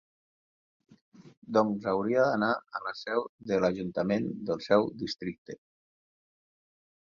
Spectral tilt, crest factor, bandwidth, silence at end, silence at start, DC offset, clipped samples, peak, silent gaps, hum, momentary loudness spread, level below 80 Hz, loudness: -6.5 dB/octave; 22 dB; 7.2 kHz; 1.5 s; 1.2 s; under 0.1%; under 0.1%; -10 dBFS; 1.37-1.42 s, 3.29-3.38 s, 5.38-5.45 s; none; 11 LU; -68 dBFS; -30 LUFS